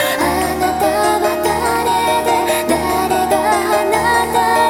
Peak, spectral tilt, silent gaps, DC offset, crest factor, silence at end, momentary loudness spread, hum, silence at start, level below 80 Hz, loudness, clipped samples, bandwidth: -2 dBFS; -3.5 dB/octave; none; under 0.1%; 12 dB; 0 s; 2 LU; none; 0 s; -38 dBFS; -15 LUFS; under 0.1%; 17.5 kHz